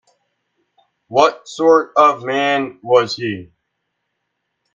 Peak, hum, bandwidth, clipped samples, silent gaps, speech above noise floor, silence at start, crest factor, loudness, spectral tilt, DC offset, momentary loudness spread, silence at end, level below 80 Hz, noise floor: 0 dBFS; none; 7.6 kHz; under 0.1%; none; 58 dB; 1.1 s; 18 dB; -16 LUFS; -4.5 dB/octave; under 0.1%; 9 LU; 1.3 s; -62 dBFS; -74 dBFS